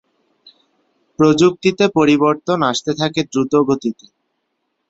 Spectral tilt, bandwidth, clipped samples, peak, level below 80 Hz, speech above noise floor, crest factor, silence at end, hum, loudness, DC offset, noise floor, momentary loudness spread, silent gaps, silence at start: -5.5 dB/octave; 8 kHz; under 0.1%; -2 dBFS; -56 dBFS; 56 dB; 16 dB; 0.95 s; none; -16 LUFS; under 0.1%; -71 dBFS; 7 LU; none; 1.2 s